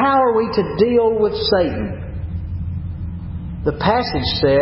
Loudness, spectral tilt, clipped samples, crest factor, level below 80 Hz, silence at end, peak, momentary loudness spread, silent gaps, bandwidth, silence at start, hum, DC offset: -19 LUFS; -10 dB/octave; under 0.1%; 16 dB; -32 dBFS; 0 s; -2 dBFS; 13 LU; none; 5.8 kHz; 0 s; none; under 0.1%